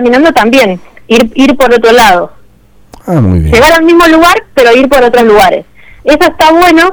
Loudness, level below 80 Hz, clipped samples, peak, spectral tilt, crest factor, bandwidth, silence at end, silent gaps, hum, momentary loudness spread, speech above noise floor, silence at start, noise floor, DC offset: -5 LUFS; -26 dBFS; 3%; 0 dBFS; -5 dB/octave; 6 dB; over 20 kHz; 0 s; none; none; 8 LU; 34 dB; 0 s; -39 dBFS; under 0.1%